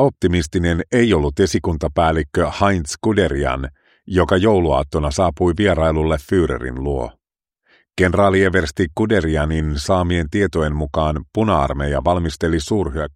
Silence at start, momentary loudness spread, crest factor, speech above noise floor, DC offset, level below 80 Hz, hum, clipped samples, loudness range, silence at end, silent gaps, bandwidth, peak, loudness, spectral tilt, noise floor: 0 s; 6 LU; 18 dB; 51 dB; under 0.1%; -30 dBFS; none; under 0.1%; 1 LU; 0.05 s; none; 13.5 kHz; 0 dBFS; -18 LUFS; -6 dB/octave; -68 dBFS